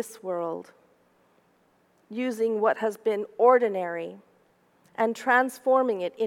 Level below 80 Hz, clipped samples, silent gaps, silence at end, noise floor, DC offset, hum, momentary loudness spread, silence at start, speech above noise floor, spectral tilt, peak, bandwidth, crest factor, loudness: -86 dBFS; under 0.1%; none; 0 s; -65 dBFS; under 0.1%; none; 15 LU; 0 s; 40 dB; -5 dB/octave; -8 dBFS; 16 kHz; 20 dB; -25 LUFS